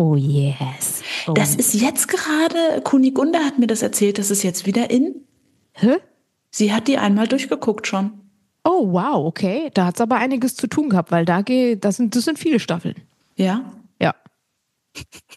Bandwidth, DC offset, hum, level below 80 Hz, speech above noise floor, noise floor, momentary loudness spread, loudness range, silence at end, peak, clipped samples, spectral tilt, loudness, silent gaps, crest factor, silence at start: 12.5 kHz; under 0.1%; none; -64 dBFS; 55 dB; -73 dBFS; 8 LU; 3 LU; 0.2 s; -2 dBFS; under 0.1%; -5 dB/octave; -19 LUFS; none; 18 dB; 0 s